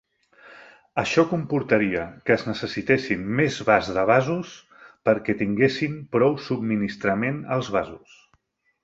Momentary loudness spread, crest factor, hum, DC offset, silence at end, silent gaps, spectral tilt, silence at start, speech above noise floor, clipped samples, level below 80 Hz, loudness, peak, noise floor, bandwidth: 8 LU; 20 dB; none; under 0.1%; 0.85 s; none; -6.5 dB/octave; 0.45 s; 44 dB; under 0.1%; -56 dBFS; -23 LUFS; -4 dBFS; -67 dBFS; 8 kHz